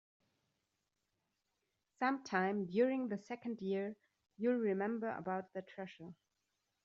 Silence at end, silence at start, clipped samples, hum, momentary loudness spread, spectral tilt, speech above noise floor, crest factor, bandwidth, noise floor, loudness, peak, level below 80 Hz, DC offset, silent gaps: 0.7 s; 2 s; under 0.1%; none; 15 LU; -5.5 dB/octave; 48 dB; 22 dB; 7.4 kHz; -87 dBFS; -39 LUFS; -20 dBFS; -84 dBFS; under 0.1%; none